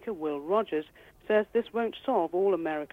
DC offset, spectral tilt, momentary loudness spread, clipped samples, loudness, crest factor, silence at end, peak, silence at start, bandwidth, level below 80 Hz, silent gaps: under 0.1%; -7 dB/octave; 7 LU; under 0.1%; -29 LUFS; 16 dB; 0.05 s; -14 dBFS; 0 s; 15 kHz; -66 dBFS; none